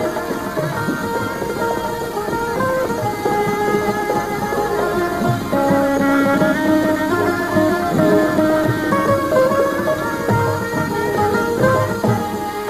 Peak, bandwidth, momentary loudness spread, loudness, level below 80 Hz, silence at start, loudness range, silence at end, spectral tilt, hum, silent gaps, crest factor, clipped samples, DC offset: -2 dBFS; 15 kHz; 6 LU; -18 LUFS; -42 dBFS; 0 s; 4 LU; 0 s; -6 dB/octave; none; none; 16 dB; under 0.1%; under 0.1%